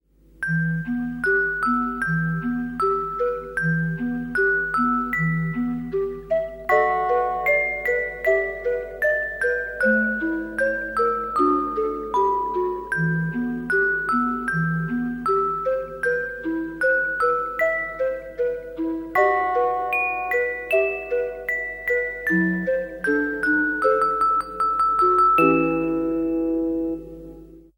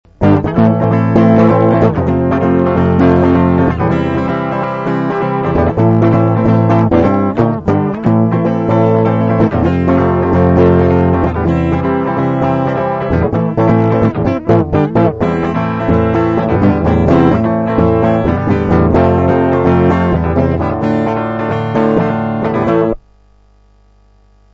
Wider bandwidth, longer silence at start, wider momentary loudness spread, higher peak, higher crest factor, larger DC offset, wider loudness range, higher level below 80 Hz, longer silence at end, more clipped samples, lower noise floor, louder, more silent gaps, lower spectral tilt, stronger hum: first, 17 kHz vs 6.8 kHz; first, 0.4 s vs 0.2 s; about the same, 7 LU vs 5 LU; second, -6 dBFS vs 0 dBFS; first, 16 dB vs 10 dB; neither; about the same, 4 LU vs 3 LU; second, -48 dBFS vs -30 dBFS; second, 0.2 s vs 1.55 s; neither; second, -43 dBFS vs -47 dBFS; second, -22 LUFS vs -12 LUFS; neither; second, -8 dB/octave vs -10 dB/octave; first, 50 Hz at -50 dBFS vs none